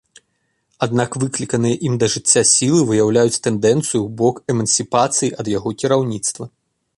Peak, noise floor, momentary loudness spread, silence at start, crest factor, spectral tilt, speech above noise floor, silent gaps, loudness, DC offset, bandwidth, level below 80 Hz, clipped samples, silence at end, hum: 0 dBFS; -68 dBFS; 9 LU; 0.8 s; 18 dB; -4 dB/octave; 51 dB; none; -17 LUFS; under 0.1%; 11.5 kHz; -54 dBFS; under 0.1%; 0.5 s; none